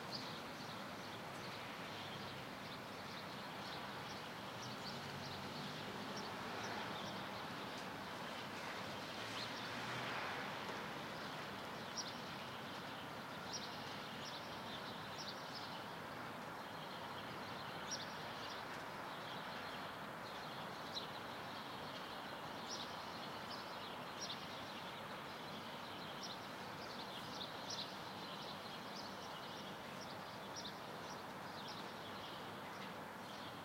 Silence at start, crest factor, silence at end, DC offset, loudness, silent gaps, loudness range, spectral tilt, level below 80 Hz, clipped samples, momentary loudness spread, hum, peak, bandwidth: 0 s; 18 dB; 0 s; under 0.1%; -48 LUFS; none; 3 LU; -3.5 dB/octave; -76 dBFS; under 0.1%; 4 LU; none; -32 dBFS; 16 kHz